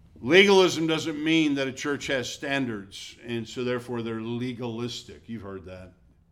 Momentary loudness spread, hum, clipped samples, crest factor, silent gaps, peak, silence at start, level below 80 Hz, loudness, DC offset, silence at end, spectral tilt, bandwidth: 21 LU; none; under 0.1%; 22 dB; none; -4 dBFS; 0.15 s; -60 dBFS; -25 LUFS; under 0.1%; 0.4 s; -4.5 dB/octave; 14.5 kHz